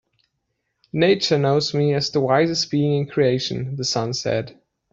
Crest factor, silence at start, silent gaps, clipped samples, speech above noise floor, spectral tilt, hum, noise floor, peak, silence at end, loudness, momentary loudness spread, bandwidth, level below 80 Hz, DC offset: 18 dB; 0.95 s; none; under 0.1%; 55 dB; -5 dB/octave; none; -75 dBFS; -4 dBFS; 0.4 s; -20 LUFS; 7 LU; 7.8 kHz; -58 dBFS; under 0.1%